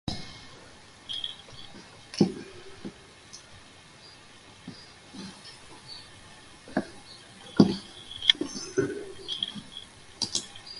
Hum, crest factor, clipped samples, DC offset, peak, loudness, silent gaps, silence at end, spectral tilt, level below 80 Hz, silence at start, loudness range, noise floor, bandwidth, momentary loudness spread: none; 32 dB; under 0.1%; under 0.1%; -2 dBFS; -29 LUFS; none; 0 s; -4 dB/octave; -60 dBFS; 0.05 s; 18 LU; -51 dBFS; 11.5 kHz; 25 LU